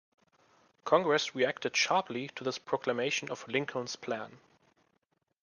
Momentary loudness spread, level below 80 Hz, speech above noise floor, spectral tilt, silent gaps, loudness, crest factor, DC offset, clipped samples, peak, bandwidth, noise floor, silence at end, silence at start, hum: 11 LU; -80 dBFS; 46 dB; -3 dB/octave; none; -32 LUFS; 22 dB; under 0.1%; under 0.1%; -12 dBFS; 10.5 kHz; -78 dBFS; 1.05 s; 0.85 s; none